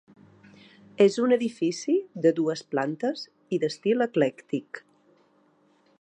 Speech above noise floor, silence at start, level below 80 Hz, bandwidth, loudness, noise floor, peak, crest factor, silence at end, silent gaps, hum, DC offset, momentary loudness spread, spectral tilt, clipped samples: 38 dB; 1 s; -80 dBFS; 10 kHz; -26 LUFS; -64 dBFS; -8 dBFS; 20 dB; 1.2 s; none; none; under 0.1%; 11 LU; -5.5 dB/octave; under 0.1%